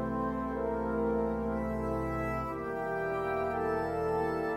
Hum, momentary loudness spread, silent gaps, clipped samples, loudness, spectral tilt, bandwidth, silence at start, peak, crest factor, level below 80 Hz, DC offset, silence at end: none; 3 LU; none; under 0.1%; -33 LUFS; -8 dB/octave; 16 kHz; 0 s; -20 dBFS; 12 dB; -46 dBFS; under 0.1%; 0 s